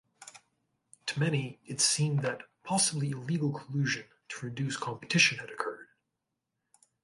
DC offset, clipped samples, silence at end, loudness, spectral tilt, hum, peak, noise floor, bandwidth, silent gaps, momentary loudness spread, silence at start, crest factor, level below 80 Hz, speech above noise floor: under 0.1%; under 0.1%; 1.2 s; -30 LUFS; -3.5 dB/octave; none; -10 dBFS; -85 dBFS; 11.5 kHz; none; 17 LU; 0.2 s; 22 dB; -74 dBFS; 54 dB